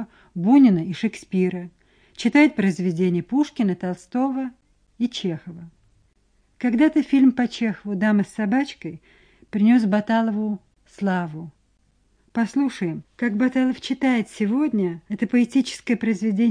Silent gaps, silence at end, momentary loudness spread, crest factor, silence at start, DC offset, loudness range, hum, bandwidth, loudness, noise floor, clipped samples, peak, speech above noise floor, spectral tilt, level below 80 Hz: none; 0 s; 13 LU; 18 dB; 0 s; under 0.1%; 5 LU; none; 10.5 kHz; -22 LUFS; -63 dBFS; under 0.1%; -4 dBFS; 42 dB; -6.5 dB/octave; -62 dBFS